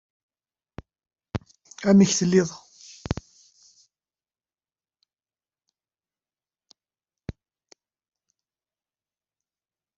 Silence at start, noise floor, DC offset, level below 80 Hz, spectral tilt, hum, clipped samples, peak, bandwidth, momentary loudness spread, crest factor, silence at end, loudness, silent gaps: 1.35 s; under -90 dBFS; under 0.1%; -54 dBFS; -5.5 dB/octave; none; under 0.1%; -6 dBFS; 7.8 kHz; 24 LU; 24 dB; 2.65 s; -23 LUFS; none